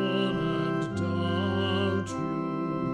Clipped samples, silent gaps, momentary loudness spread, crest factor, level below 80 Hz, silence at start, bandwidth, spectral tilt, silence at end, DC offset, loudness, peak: under 0.1%; none; 4 LU; 12 dB; -56 dBFS; 0 s; 10.5 kHz; -6.5 dB/octave; 0 s; under 0.1%; -29 LUFS; -16 dBFS